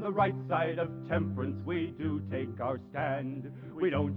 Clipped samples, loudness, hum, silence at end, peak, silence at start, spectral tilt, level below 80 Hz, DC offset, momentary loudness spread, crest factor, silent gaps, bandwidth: under 0.1%; -33 LUFS; none; 0 s; -14 dBFS; 0 s; -10 dB/octave; -62 dBFS; under 0.1%; 6 LU; 18 dB; none; 4.8 kHz